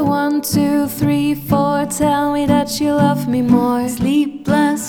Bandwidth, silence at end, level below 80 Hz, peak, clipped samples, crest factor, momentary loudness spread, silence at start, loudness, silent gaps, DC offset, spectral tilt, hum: 19.5 kHz; 0 s; -44 dBFS; 0 dBFS; under 0.1%; 14 dB; 3 LU; 0 s; -16 LUFS; none; under 0.1%; -5.5 dB/octave; none